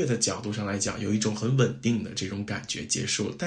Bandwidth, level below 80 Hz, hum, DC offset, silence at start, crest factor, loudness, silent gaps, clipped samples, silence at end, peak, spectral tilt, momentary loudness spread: 10.5 kHz; -60 dBFS; none; under 0.1%; 0 s; 18 dB; -28 LUFS; none; under 0.1%; 0 s; -10 dBFS; -4 dB/octave; 7 LU